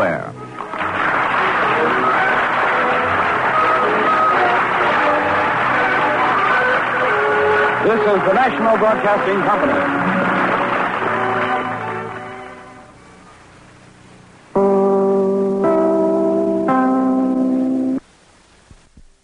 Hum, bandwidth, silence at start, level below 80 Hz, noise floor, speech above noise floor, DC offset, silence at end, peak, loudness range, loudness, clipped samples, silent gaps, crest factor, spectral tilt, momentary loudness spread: none; 10.5 kHz; 0 s; -52 dBFS; -49 dBFS; 34 dB; under 0.1%; 1.25 s; -4 dBFS; 7 LU; -16 LUFS; under 0.1%; none; 12 dB; -6.5 dB/octave; 8 LU